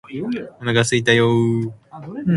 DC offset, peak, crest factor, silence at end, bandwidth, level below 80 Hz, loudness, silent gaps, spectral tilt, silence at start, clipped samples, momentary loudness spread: under 0.1%; 0 dBFS; 18 dB; 0 s; 11.5 kHz; -54 dBFS; -18 LUFS; none; -5.5 dB/octave; 0.1 s; under 0.1%; 15 LU